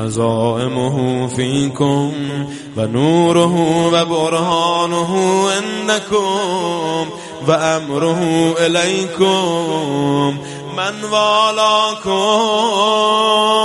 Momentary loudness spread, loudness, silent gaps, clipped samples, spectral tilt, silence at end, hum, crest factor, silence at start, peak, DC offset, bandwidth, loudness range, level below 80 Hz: 8 LU; -15 LUFS; none; under 0.1%; -4.5 dB/octave; 0 s; none; 14 dB; 0 s; 0 dBFS; under 0.1%; 11.5 kHz; 2 LU; -54 dBFS